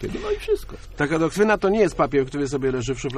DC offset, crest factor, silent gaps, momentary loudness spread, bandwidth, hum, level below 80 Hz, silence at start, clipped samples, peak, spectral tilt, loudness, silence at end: under 0.1%; 16 dB; none; 8 LU; 13.5 kHz; none; -40 dBFS; 0 s; under 0.1%; -6 dBFS; -6 dB/octave; -22 LUFS; 0 s